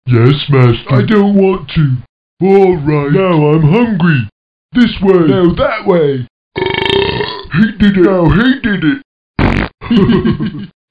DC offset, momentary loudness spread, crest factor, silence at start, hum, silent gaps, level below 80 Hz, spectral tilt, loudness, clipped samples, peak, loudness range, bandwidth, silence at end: 0.5%; 9 LU; 10 dB; 0.05 s; none; 2.09-2.37 s, 4.32-4.69 s, 6.30-6.51 s, 9.05-9.34 s, 9.74-9.78 s; -30 dBFS; -9 dB/octave; -11 LUFS; 0.6%; 0 dBFS; 2 LU; 6.2 kHz; 0.25 s